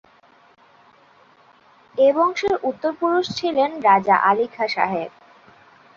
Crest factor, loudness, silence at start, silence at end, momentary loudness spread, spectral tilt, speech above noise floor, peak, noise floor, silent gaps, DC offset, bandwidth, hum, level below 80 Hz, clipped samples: 18 dB; -19 LUFS; 1.95 s; 0.9 s; 8 LU; -5 dB/octave; 35 dB; -4 dBFS; -54 dBFS; none; under 0.1%; 7.4 kHz; none; -64 dBFS; under 0.1%